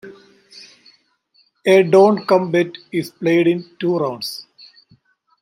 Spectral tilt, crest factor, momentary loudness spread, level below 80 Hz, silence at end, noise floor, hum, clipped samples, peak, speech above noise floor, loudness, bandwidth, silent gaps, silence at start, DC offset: -6.5 dB/octave; 16 dB; 13 LU; -68 dBFS; 1 s; -60 dBFS; none; under 0.1%; -2 dBFS; 44 dB; -17 LUFS; 16 kHz; none; 0.05 s; under 0.1%